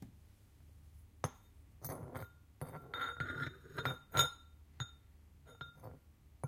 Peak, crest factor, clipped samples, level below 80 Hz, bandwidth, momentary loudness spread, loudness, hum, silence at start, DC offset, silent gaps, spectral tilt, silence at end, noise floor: -16 dBFS; 28 dB; under 0.1%; -62 dBFS; 16 kHz; 26 LU; -41 LUFS; none; 0 s; under 0.1%; none; -3 dB/octave; 0 s; -62 dBFS